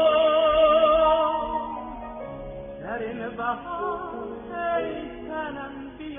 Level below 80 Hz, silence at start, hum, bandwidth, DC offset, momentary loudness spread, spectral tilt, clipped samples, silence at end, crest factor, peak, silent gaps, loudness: -48 dBFS; 0 s; none; 3.7 kHz; under 0.1%; 18 LU; -0.5 dB/octave; under 0.1%; 0 s; 16 dB; -10 dBFS; none; -24 LUFS